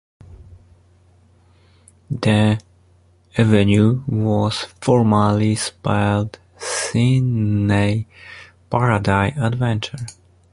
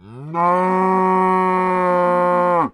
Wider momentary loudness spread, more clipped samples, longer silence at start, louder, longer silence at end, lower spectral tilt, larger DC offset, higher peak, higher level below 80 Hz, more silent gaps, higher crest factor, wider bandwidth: first, 14 LU vs 2 LU; neither; first, 0.3 s vs 0.05 s; about the same, -18 LUFS vs -16 LUFS; first, 0.4 s vs 0.05 s; second, -6 dB/octave vs -8.5 dB/octave; neither; first, 0 dBFS vs -4 dBFS; first, -42 dBFS vs -58 dBFS; neither; first, 18 dB vs 12 dB; about the same, 11.5 kHz vs 11 kHz